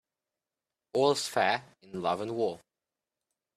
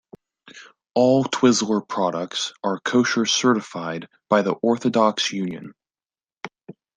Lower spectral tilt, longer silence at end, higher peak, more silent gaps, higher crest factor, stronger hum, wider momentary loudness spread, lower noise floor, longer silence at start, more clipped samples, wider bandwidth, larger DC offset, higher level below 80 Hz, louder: about the same, -3.5 dB/octave vs -4 dB/octave; first, 1 s vs 0.25 s; second, -12 dBFS vs -2 dBFS; neither; about the same, 22 dB vs 20 dB; neither; second, 9 LU vs 15 LU; about the same, under -90 dBFS vs under -90 dBFS; first, 0.95 s vs 0.45 s; neither; first, 14.5 kHz vs 10 kHz; neither; second, -76 dBFS vs -68 dBFS; second, -30 LUFS vs -21 LUFS